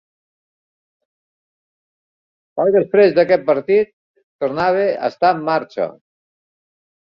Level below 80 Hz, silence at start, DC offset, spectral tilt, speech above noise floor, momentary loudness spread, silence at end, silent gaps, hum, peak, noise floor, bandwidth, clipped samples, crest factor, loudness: -62 dBFS; 2.55 s; under 0.1%; -7.5 dB/octave; over 74 dB; 12 LU; 1.2 s; 3.93-4.14 s, 4.23-4.39 s; none; -2 dBFS; under -90 dBFS; 6 kHz; under 0.1%; 18 dB; -17 LUFS